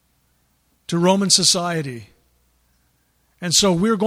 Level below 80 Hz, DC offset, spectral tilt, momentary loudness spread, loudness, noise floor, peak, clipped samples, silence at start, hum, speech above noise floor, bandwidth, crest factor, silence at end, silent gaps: -54 dBFS; under 0.1%; -3 dB/octave; 18 LU; -17 LUFS; -64 dBFS; 0 dBFS; under 0.1%; 0.9 s; none; 46 dB; 15.5 kHz; 20 dB; 0 s; none